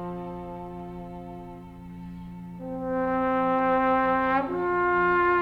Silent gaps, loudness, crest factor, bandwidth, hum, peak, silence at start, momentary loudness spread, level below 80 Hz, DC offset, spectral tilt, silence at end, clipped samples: none; -25 LUFS; 14 dB; 5.6 kHz; 60 Hz at -50 dBFS; -14 dBFS; 0 s; 18 LU; -50 dBFS; under 0.1%; -8.5 dB/octave; 0 s; under 0.1%